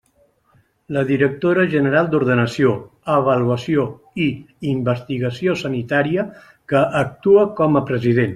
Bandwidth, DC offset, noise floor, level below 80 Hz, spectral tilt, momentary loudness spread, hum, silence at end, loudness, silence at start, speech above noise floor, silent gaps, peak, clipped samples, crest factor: 11 kHz; under 0.1%; -59 dBFS; -54 dBFS; -7.5 dB/octave; 8 LU; none; 0 s; -18 LUFS; 0.9 s; 42 dB; none; -2 dBFS; under 0.1%; 16 dB